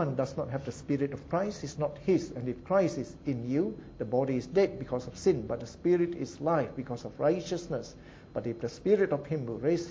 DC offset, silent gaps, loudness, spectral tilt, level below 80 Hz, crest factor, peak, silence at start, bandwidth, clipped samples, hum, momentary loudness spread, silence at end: under 0.1%; none; -31 LUFS; -7 dB/octave; -56 dBFS; 16 dB; -14 dBFS; 0 s; 8 kHz; under 0.1%; none; 10 LU; 0 s